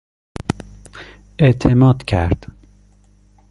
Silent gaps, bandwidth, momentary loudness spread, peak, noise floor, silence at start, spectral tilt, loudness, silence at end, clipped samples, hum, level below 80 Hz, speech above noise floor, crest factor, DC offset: none; 11 kHz; 25 LU; -2 dBFS; -51 dBFS; 0.5 s; -8 dB/octave; -16 LUFS; 1.15 s; under 0.1%; 50 Hz at -40 dBFS; -32 dBFS; 37 dB; 16 dB; under 0.1%